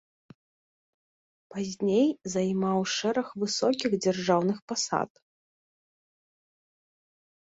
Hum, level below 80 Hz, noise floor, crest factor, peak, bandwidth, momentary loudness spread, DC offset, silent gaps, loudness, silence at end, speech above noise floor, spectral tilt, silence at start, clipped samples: none; -70 dBFS; under -90 dBFS; 20 dB; -10 dBFS; 8 kHz; 7 LU; under 0.1%; 4.62-4.68 s; -28 LUFS; 2.35 s; over 63 dB; -4.5 dB/octave; 1.5 s; under 0.1%